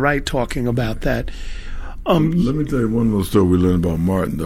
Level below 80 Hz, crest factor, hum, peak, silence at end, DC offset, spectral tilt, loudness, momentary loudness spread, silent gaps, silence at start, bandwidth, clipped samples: -30 dBFS; 16 dB; none; -2 dBFS; 0 s; 0.9%; -7 dB/octave; -19 LUFS; 16 LU; none; 0 s; 16 kHz; under 0.1%